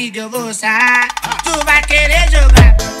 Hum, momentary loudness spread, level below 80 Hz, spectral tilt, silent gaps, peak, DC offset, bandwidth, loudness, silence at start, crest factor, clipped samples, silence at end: none; 11 LU; -12 dBFS; -4 dB/octave; none; 0 dBFS; under 0.1%; 15 kHz; -11 LUFS; 0 s; 10 dB; under 0.1%; 0 s